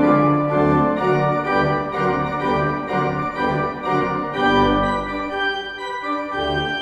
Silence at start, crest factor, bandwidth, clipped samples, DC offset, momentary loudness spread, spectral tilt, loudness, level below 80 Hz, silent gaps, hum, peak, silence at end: 0 s; 16 dB; 10 kHz; under 0.1%; under 0.1%; 7 LU; -7 dB/octave; -20 LUFS; -40 dBFS; none; none; -4 dBFS; 0 s